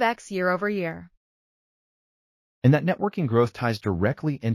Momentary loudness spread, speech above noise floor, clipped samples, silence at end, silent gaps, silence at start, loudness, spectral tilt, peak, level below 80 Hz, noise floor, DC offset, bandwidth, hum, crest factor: 7 LU; over 66 dB; under 0.1%; 0 s; 1.17-2.62 s; 0 s; -24 LUFS; -7.5 dB/octave; -6 dBFS; -56 dBFS; under -90 dBFS; under 0.1%; 14.5 kHz; none; 18 dB